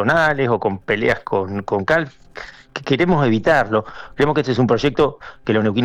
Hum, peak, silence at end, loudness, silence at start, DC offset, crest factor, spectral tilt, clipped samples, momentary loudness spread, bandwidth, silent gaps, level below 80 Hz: none; -6 dBFS; 0 s; -18 LUFS; 0 s; under 0.1%; 12 dB; -7 dB/octave; under 0.1%; 15 LU; 11 kHz; none; -44 dBFS